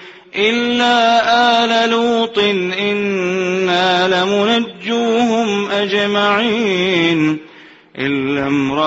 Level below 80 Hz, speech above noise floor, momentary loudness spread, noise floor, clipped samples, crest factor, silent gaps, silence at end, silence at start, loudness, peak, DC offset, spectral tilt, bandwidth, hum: -56 dBFS; 26 dB; 6 LU; -41 dBFS; under 0.1%; 14 dB; none; 0 s; 0 s; -15 LUFS; -2 dBFS; under 0.1%; -4.5 dB/octave; 8 kHz; none